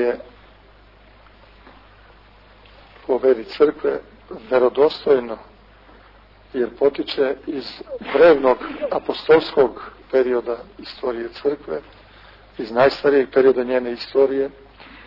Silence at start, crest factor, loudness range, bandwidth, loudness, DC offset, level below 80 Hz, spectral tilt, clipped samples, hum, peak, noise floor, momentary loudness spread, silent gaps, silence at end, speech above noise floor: 0 s; 16 dB; 6 LU; 5.8 kHz; -19 LUFS; under 0.1%; -52 dBFS; -7 dB/octave; under 0.1%; none; -4 dBFS; -49 dBFS; 16 LU; none; 0.55 s; 30 dB